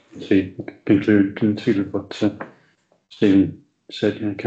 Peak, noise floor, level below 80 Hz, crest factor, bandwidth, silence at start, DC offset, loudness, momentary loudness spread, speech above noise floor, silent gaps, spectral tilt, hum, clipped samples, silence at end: -4 dBFS; -61 dBFS; -62 dBFS; 16 dB; 7.6 kHz; 0.15 s; under 0.1%; -20 LUFS; 15 LU; 42 dB; none; -7.5 dB/octave; none; under 0.1%; 0 s